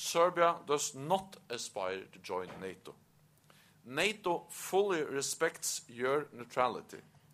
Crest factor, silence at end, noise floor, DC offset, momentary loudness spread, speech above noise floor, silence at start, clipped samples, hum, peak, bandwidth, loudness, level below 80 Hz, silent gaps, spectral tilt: 22 dB; 0.3 s; -65 dBFS; under 0.1%; 15 LU; 30 dB; 0 s; under 0.1%; none; -12 dBFS; 15.5 kHz; -34 LUFS; -78 dBFS; none; -2.5 dB/octave